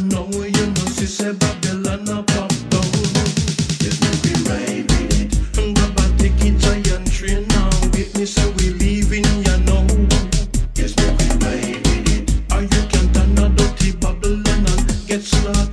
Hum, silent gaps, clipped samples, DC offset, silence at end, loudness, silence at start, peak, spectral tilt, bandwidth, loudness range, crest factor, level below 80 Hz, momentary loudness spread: none; none; under 0.1%; under 0.1%; 0 s; -18 LUFS; 0 s; 0 dBFS; -5 dB/octave; 11 kHz; 1 LU; 16 dB; -18 dBFS; 5 LU